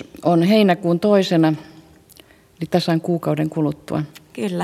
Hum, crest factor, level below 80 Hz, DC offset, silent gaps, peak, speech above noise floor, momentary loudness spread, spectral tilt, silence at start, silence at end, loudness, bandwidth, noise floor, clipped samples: none; 16 dB; -58 dBFS; under 0.1%; none; -2 dBFS; 31 dB; 12 LU; -7 dB/octave; 0 s; 0 s; -19 LUFS; 15 kHz; -49 dBFS; under 0.1%